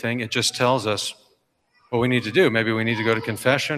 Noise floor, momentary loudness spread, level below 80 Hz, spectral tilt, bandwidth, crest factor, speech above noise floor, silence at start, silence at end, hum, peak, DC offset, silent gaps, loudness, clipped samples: -65 dBFS; 7 LU; -62 dBFS; -4.5 dB/octave; 15.5 kHz; 16 dB; 44 dB; 0 s; 0 s; none; -6 dBFS; under 0.1%; none; -21 LUFS; under 0.1%